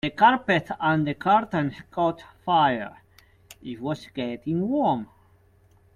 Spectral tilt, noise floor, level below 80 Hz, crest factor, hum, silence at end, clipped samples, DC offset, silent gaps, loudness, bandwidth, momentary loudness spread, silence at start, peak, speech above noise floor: -7 dB/octave; -58 dBFS; -60 dBFS; 20 dB; none; 0.9 s; under 0.1%; under 0.1%; none; -24 LUFS; 14.5 kHz; 14 LU; 0.05 s; -4 dBFS; 35 dB